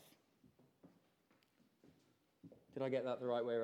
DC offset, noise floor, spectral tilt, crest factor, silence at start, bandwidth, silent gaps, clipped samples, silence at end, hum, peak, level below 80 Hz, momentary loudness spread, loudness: under 0.1%; -77 dBFS; -7 dB/octave; 18 dB; 0.85 s; 14.5 kHz; none; under 0.1%; 0 s; none; -28 dBFS; under -90 dBFS; 24 LU; -41 LUFS